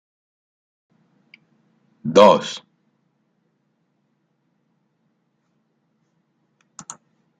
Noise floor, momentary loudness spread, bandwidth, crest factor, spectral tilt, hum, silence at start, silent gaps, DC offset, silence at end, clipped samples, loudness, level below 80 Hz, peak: -69 dBFS; 27 LU; 9.2 kHz; 24 dB; -5 dB/octave; none; 2.05 s; none; under 0.1%; 4.85 s; under 0.1%; -16 LUFS; -70 dBFS; 0 dBFS